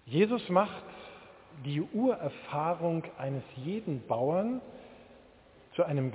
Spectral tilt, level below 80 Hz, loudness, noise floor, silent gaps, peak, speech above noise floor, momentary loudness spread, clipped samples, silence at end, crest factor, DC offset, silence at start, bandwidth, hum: -6.5 dB/octave; -68 dBFS; -32 LUFS; -58 dBFS; none; -12 dBFS; 27 dB; 21 LU; under 0.1%; 0 s; 22 dB; under 0.1%; 0.05 s; 4 kHz; none